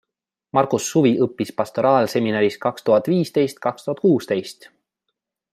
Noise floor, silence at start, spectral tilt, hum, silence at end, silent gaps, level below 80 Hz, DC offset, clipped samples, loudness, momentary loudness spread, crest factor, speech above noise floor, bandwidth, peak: -84 dBFS; 0.55 s; -6 dB/octave; none; 1 s; none; -66 dBFS; under 0.1%; under 0.1%; -20 LUFS; 8 LU; 18 dB; 64 dB; 15.5 kHz; -2 dBFS